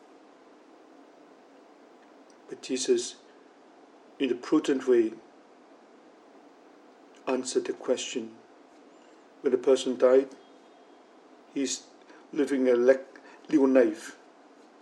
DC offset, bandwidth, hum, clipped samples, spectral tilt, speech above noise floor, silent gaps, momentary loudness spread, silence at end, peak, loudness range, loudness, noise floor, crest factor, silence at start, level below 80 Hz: under 0.1%; 11.5 kHz; none; under 0.1%; -3.5 dB/octave; 30 dB; none; 19 LU; 0.65 s; -8 dBFS; 8 LU; -27 LUFS; -55 dBFS; 22 dB; 2.5 s; under -90 dBFS